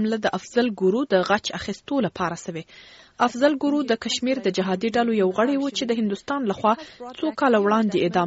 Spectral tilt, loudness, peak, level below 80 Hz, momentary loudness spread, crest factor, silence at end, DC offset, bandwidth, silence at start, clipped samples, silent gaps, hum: -4 dB/octave; -23 LUFS; -4 dBFS; -60 dBFS; 8 LU; 18 dB; 0 s; under 0.1%; 8 kHz; 0 s; under 0.1%; none; none